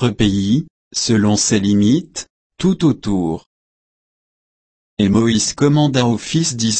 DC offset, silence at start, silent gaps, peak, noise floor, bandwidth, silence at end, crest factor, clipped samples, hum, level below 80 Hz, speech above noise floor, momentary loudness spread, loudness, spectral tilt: under 0.1%; 0 s; 0.70-0.91 s, 2.30-2.50 s, 3.46-4.97 s; -2 dBFS; under -90 dBFS; 8.8 kHz; 0 s; 14 dB; under 0.1%; none; -44 dBFS; over 75 dB; 9 LU; -16 LUFS; -5 dB/octave